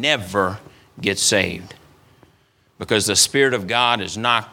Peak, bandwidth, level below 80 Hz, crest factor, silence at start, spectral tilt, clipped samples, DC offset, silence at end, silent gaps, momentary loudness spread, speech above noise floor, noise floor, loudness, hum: 0 dBFS; 18 kHz; -56 dBFS; 20 dB; 0 s; -2 dB/octave; under 0.1%; under 0.1%; 0 s; none; 10 LU; 39 dB; -59 dBFS; -18 LUFS; none